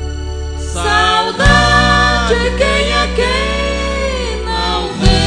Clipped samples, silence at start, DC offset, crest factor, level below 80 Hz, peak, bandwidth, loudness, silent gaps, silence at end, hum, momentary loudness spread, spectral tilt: 0.2%; 0 s; under 0.1%; 14 dB; -20 dBFS; 0 dBFS; 10 kHz; -13 LUFS; none; 0 s; none; 10 LU; -4 dB/octave